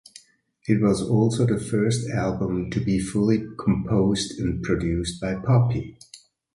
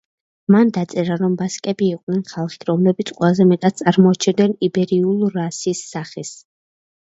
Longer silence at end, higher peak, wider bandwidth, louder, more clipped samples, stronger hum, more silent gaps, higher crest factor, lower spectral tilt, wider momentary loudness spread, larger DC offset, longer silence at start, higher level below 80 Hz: second, 0.4 s vs 0.65 s; second, -6 dBFS vs 0 dBFS; first, 11.5 kHz vs 8 kHz; second, -23 LUFS vs -18 LUFS; neither; neither; second, none vs 2.03-2.07 s; about the same, 18 dB vs 18 dB; about the same, -6.5 dB/octave vs -6.5 dB/octave; second, 7 LU vs 12 LU; neither; first, 0.65 s vs 0.5 s; first, -42 dBFS vs -62 dBFS